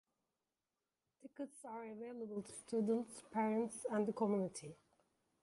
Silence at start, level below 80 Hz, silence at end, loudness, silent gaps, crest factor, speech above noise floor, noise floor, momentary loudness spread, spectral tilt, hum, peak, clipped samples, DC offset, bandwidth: 1.25 s; -84 dBFS; 0.7 s; -42 LUFS; none; 18 dB; over 49 dB; under -90 dBFS; 13 LU; -6 dB/octave; none; -26 dBFS; under 0.1%; under 0.1%; 11.5 kHz